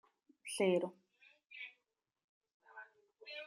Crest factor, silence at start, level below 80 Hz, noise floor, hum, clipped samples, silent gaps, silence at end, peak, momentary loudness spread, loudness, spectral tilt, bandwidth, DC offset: 22 dB; 0.45 s; under -90 dBFS; -87 dBFS; none; under 0.1%; 2.24-2.41 s, 2.54-2.60 s; 0 s; -22 dBFS; 24 LU; -39 LUFS; -4.5 dB/octave; 14 kHz; under 0.1%